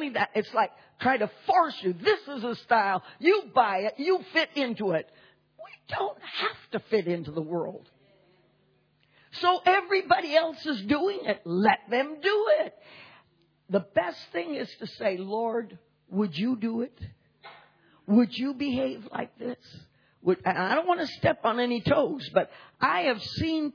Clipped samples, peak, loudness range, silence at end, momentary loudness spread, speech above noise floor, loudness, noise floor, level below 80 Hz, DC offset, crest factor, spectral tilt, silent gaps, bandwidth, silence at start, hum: under 0.1%; -8 dBFS; 6 LU; 0.05 s; 11 LU; 40 dB; -27 LUFS; -67 dBFS; -64 dBFS; under 0.1%; 20 dB; -6.5 dB/octave; none; 5.4 kHz; 0 s; none